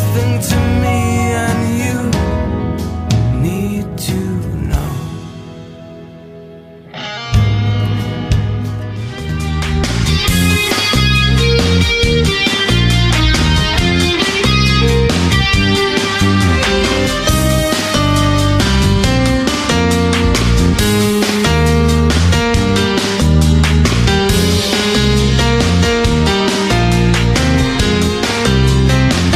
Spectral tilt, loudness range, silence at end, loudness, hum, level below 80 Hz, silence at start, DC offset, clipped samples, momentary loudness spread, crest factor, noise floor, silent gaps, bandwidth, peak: -5 dB/octave; 7 LU; 0 s; -13 LUFS; none; -20 dBFS; 0 s; under 0.1%; under 0.1%; 8 LU; 12 dB; -35 dBFS; none; 15.5 kHz; 0 dBFS